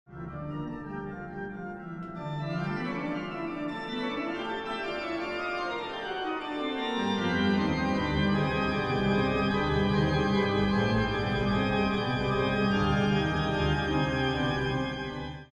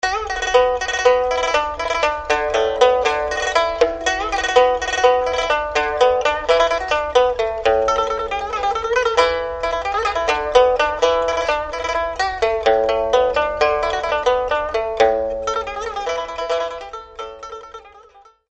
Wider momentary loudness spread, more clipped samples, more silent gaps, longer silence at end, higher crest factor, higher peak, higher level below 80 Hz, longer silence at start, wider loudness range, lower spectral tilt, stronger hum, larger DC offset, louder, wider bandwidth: first, 11 LU vs 8 LU; neither; neither; second, 0.1 s vs 0.5 s; about the same, 14 dB vs 18 dB; second, -14 dBFS vs 0 dBFS; about the same, -44 dBFS vs -40 dBFS; about the same, 0.1 s vs 0.05 s; first, 8 LU vs 4 LU; first, -7 dB/octave vs -2 dB/octave; neither; neither; second, -29 LUFS vs -18 LUFS; about the same, 9.6 kHz vs 9 kHz